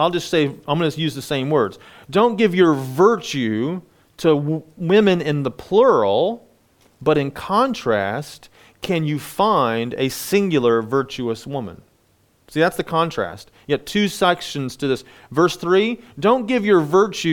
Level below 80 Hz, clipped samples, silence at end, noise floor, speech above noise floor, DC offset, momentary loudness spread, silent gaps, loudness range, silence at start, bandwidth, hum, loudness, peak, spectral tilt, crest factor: -54 dBFS; under 0.1%; 0 s; -60 dBFS; 41 dB; under 0.1%; 11 LU; none; 4 LU; 0 s; 19 kHz; none; -19 LUFS; -2 dBFS; -5.5 dB/octave; 18 dB